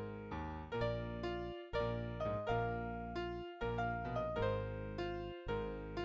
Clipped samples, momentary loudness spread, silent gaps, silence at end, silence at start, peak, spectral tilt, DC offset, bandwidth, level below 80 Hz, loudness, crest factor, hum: under 0.1%; 7 LU; none; 0 s; 0 s; -24 dBFS; -8 dB/octave; under 0.1%; 7.8 kHz; -52 dBFS; -41 LUFS; 16 dB; none